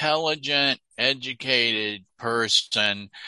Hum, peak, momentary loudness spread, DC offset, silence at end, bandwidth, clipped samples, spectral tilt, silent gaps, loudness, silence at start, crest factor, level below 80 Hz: none; -4 dBFS; 7 LU; under 0.1%; 0 s; 11.5 kHz; under 0.1%; -2 dB/octave; none; -22 LUFS; 0 s; 20 dB; -68 dBFS